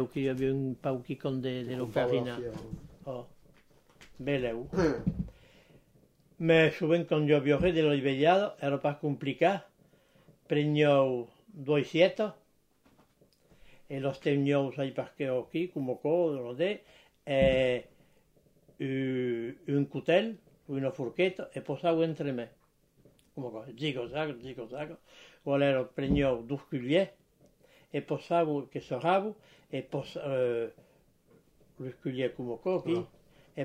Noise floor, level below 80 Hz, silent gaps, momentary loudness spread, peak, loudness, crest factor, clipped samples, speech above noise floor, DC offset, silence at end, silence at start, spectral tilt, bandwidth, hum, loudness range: -67 dBFS; -56 dBFS; none; 16 LU; -10 dBFS; -31 LUFS; 22 dB; under 0.1%; 37 dB; under 0.1%; 0 s; 0 s; -7.5 dB/octave; 12 kHz; none; 8 LU